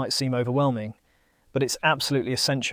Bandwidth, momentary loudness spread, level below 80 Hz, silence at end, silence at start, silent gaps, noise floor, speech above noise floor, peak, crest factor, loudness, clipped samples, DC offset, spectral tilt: 19 kHz; 10 LU; -62 dBFS; 0 s; 0 s; none; -64 dBFS; 39 dB; -8 dBFS; 18 dB; -25 LUFS; under 0.1%; under 0.1%; -4 dB/octave